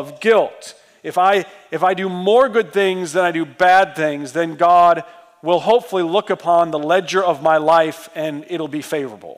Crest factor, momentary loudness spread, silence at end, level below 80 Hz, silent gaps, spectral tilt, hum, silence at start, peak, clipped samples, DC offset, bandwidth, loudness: 12 dB; 12 LU; 0.05 s; -66 dBFS; none; -4.5 dB/octave; none; 0 s; -4 dBFS; under 0.1%; under 0.1%; 15.5 kHz; -17 LUFS